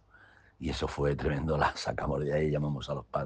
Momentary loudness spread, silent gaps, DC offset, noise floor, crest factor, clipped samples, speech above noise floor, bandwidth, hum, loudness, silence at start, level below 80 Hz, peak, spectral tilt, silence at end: 7 LU; none; under 0.1%; -59 dBFS; 20 dB; under 0.1%; 28 dB; 9.4 kHz; none; -32 LUFS; 0.6 s; -46 dBFS; -12 dBFS; -6.5 dB/octave; 0 s